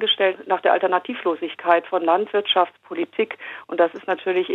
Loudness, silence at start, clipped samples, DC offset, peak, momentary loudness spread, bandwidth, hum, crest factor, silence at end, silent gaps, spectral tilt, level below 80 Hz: -21 LUFS; 0 s; under 0.1%; under 0.1%; -2 dBFS; 8 LU; 4.2 kHz; none; 18 dB; 0 s; none; -5.5 dB/octave; -82 dBFS